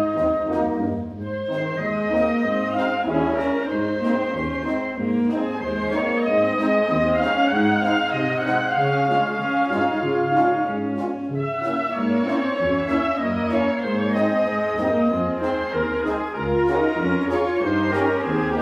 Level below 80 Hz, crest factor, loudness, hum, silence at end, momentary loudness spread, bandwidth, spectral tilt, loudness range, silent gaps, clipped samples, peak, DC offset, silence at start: -46 dBFS; 14 dB; -22 LUFS; none; 0 s; 6 LU; 9 kHz; -7.5 dB/octave; 3 LU; none; under 0.1%; -8 dBFS; under 0.1%; 0 s